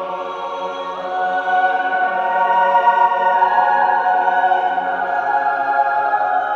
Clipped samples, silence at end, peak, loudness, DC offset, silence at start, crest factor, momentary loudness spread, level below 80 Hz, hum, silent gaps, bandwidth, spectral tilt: under 0.1%; 0 s; -2 dBFS; -17 LUFS; under 0.1%; 0 s; 14 dB; 10 LU; -64 dBFS; none; none; 6.8 kHz; -4 dB/octave